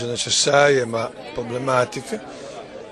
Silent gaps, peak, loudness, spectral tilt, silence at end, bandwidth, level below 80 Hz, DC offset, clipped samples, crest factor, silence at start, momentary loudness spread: none; 0 dBFS; -19 LUFS; -3 dB/octave; 0 s; 12.5 kHz; -56 dBFS; under 0.1%; under 0.1%; 22 dB; 0 s; 20 LU